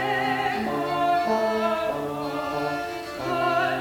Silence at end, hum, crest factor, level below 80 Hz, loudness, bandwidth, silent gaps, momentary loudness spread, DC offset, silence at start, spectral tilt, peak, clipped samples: 0 s; none; 14 dB; -56 dBFS; -25 LUFS; 18.5 kHz; none; 6 LU; under 0.1%; 0 s; -5 dB/octave; -12 dBFS; under 0.1%